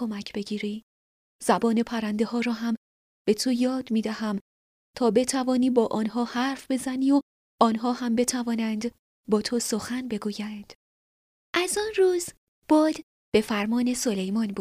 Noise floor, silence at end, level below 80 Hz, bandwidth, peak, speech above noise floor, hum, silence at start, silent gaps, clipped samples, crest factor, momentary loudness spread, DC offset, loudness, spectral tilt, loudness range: under -90 dBFS; 0 s; -62 dBFS; 15.5 kHz; -6 dBFS; over 65 dB; none; 0 s; 0.83-1.39 s, 2.77-3.25 s, 4.41-4.94 s, 7.22-7.58 s, 8.99-9.24 s, 10.75-11.53 s, 12.37-12.62 s, 13.03-13.32 s; under 0.1%; 22 dB; 9 LU; under 0.1%; -26 LUFS; -4.5 dB/octave; 4 LU